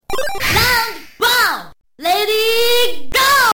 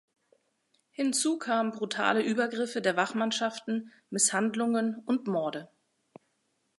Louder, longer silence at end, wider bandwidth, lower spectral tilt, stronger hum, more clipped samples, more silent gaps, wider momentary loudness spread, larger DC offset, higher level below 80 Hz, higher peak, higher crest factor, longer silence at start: first, -14 LUFS vs -29 LUFS; second, 0 s vs 1.15 s; first, 17.5 kHz vs 11.5 kHz; second, -1.5 dB/octave vs -3 dB/octave; neither; neither; neither; about the same, 10 LU vs 9 LU; neither; first, -36 dBFS vs -84 dBFS; first, -2 dBFS vs -8 dBFS; second, 14 dB vs 22 dB; second, 0 s vs 1 s